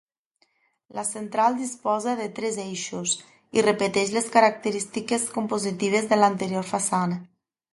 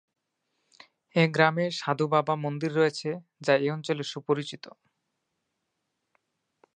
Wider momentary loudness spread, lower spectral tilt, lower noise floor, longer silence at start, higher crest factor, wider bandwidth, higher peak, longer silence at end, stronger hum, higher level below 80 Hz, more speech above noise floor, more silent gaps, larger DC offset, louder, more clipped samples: about the same, 10 LU vs 10 LU; second, -4 dB/octave vs -6 dB/octave; second, -70 dBFS vs -81 dBFS; second, 0.95 s vs 1.15 s; about the same, 22 dB vs 24 dB; first, 11.5 kHz vs 9.6 kHz; about the same, -2 dBFS vs -4 dBFS; second, 0.5 s vs 2.05 s; neither; first, -70 dBFS vs -82 dBFS; second, 45 dB vs 54 dB; neither; neither; first, -24 LUFS vs -27 LUFS; neither